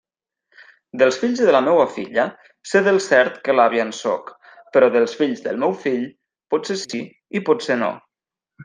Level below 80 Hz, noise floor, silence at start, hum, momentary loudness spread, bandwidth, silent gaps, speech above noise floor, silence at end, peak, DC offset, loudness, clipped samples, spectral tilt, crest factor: -70 dBFS; -87 dBFS; 0.95 s; none; 12 LU; 9.8 kHz; none; 69 dB; 0 s; -2 dBFS; under 0.1%; -19 LUFS; under 0.1%; -4.5 dB/octave; 18 dB